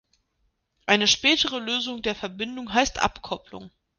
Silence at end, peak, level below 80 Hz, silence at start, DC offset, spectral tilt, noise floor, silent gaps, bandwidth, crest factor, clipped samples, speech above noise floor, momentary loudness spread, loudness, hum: 0.3 s; -4 dBFS; -50 dBFS; 0.85 s; under 0.1%; -2 dB/octave; -72 dBFS; none; 10.5 kHz; 22 dB; under 0.1%; 47 dB; 16 LU; -23 LUFS; none